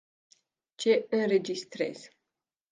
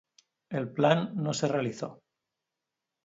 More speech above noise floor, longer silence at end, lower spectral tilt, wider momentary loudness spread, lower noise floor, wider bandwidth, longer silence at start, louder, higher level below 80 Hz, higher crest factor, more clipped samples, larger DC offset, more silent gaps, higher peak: about the same, 60 dB vs 59 dB; second, 0.65 s vs 1.1 s; about the same, -4.5 dB/octave vs -5.5 dB/octave; second, 10 LU vs 13 LU; about the same, -88 dBFS vs -87 dBFS; first, 9.6 kHz vs 8 kHz; first, 0.8 s vs 0.5 s; about the same, -29 LUFS vs -29 LUFS; second, -82 dBFS vs -74 dBFS; second, 18 dB vs 24 dB; neither; neither; neither; second, -12 dBFS vs -8 dBFS